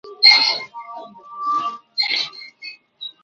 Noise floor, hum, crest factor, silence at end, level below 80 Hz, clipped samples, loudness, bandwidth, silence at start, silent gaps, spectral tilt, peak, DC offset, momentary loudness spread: -40 dBFS; none; 20 dB; 0.15 s; -78 dBFS; under 0.1%; -16 LUFS; 7.8 kHz; 0.05 s; none; 1 dB/octave; 0 dBFS; under 0.1%; 26 LU